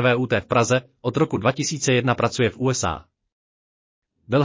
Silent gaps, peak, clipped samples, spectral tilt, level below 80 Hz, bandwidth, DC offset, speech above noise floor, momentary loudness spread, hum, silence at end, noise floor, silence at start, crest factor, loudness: 3.32-4.02 s; -4 dBFS; under 0.1%; -5 dB/octave; -48 dBFS; 7.8 kHz; under 0.1%; over 69 dB; 5 LU; none; 0 s; under -90 dBFS; 0 s; 18 dB; -21 LUFS